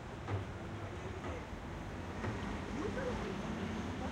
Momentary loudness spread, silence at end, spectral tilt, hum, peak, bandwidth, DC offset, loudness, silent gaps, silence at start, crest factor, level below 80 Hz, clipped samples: 5 LU; 0 s; -6.5 dB/octave; none; -26 dBFS; 13 kHz; under 0.1%; -42 LUFS; none; 0 s; 14 dB; -52 dBFS; under 0.1%